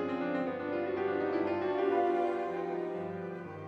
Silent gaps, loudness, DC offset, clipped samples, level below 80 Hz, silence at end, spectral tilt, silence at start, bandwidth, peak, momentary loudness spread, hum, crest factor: none; -33 LUFS; under 0.1%; under 0.1%; -76 dBFS; 0 s; -8 dB/octave; 0 s; 6.4 kHz; -20 dBFS; 9 LU; none; 14 dB